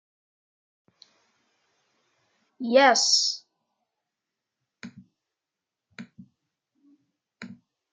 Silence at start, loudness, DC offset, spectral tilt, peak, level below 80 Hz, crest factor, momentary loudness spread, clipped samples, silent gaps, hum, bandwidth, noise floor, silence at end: 2.6 s; -21 LUFS; under 0.1%; -0.5 dB/octave; -6 dBFS; -88 dBFS; 24 dB; 28 LU; under 0.1%; none; none; 11 kHz; -88 dBFS; 0.4 s